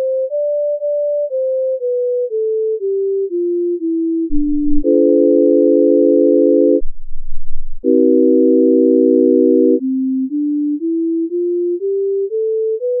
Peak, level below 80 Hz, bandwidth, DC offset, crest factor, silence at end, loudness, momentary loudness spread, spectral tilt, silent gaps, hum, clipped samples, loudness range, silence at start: -2 dBFS; -28 dBFS; 0.7 kHz; under 0.1%; 12 dB; 0 s; -15 LUFS; 7 LU; -9.5 dB/octave; none; none; under 0.1%; 5 LU; 0 s